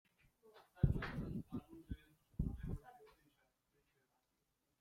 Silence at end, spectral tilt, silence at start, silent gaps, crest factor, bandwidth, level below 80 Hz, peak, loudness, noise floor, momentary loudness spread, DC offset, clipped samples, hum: 1.7 s; -8.5 dB/octave; 0.45 s; none; 28 dB; 15.5 kHz; -52 dBFS; -18 dBFS; -45 LUFS; -85 dBFS; 21 LU; under 0.1%; under 0.1%; none